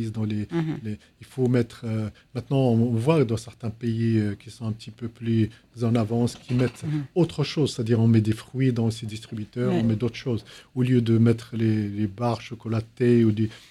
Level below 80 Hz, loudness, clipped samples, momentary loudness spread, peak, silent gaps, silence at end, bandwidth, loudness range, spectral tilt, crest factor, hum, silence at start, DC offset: -56 dBFS; -25 LUFS; under 0.1%; 13 LU; -6 dBFS; none; 0.1 s; 12 kHz; 2 LU; -8 dB/octave; 18 dB; none; 0 s; under 0.1%